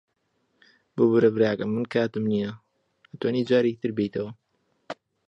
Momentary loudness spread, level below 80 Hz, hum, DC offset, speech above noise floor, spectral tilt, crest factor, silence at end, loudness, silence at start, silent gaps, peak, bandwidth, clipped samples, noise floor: 18 LU; -66 dBFS; none; under 0.1%; 49 dB; -8 dB/octave; 18 dB; 0.35 s; -25 LUFS; 0.95 s; none; -8 dBFS; 8 kHz; under 0.1%; -73 dBFS